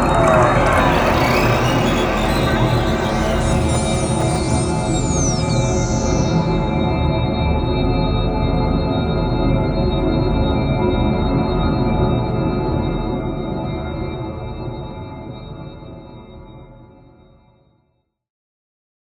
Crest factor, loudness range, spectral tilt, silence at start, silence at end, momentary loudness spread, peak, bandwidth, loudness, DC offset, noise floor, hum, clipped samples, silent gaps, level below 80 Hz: 18 dB; 13 LU; -6 dB/octave; 0 s; 2.25 s; 13 LU; 0 dBFS; over 20 kHz; -18 LUFS; under 0.1%; -66 dBFS; none; under 0.1%; none; -26 dBFS